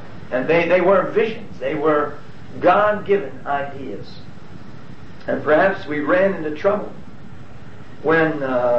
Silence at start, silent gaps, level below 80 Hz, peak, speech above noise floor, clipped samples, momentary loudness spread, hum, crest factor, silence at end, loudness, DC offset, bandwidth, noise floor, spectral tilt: 0 s; none; -52 dBFS; -4 dBFS; 21 dB; under 0.1%; 24 LU; none; 16 dB; 0 s; -19 LUFS; 3%; 7.8 kHz; -40 dBFS; -7.5 dB/octave